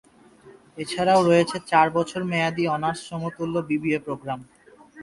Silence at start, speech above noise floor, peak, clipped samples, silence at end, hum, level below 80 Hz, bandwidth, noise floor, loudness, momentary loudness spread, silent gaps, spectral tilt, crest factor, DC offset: 0.45 s; 28 dB; -4 dBFS; under 0.1%; 0 s; none; -60 dBFS; 11.5 kHz; -51 dBFS; -23 LUFS; 13 LU; none; -5.5 dB/octave; 20 dB; under 0.1%